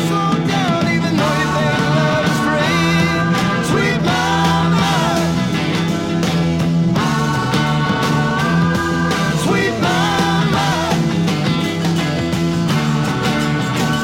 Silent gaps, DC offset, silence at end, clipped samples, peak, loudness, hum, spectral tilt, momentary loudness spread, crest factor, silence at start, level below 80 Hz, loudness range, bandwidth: none; under 0.1%; 0 s; under 0.1%; -2 dBFS; -16 LUFS; none; -5.5 dB/octave; 3 LU; 14 dB; 0 s; -40 dBFS; 1 LU; 16.5 kHz